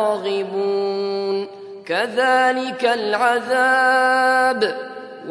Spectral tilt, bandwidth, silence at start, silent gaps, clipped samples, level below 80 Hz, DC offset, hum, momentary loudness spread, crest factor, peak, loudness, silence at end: -3.5 dB/octave; 11 kHz; 0 s; none; under 0.1%; -76 dBFS; under 0.1%; none; 11 LU; 14 dB; -4 dBFS; -18 LUFS; 0 s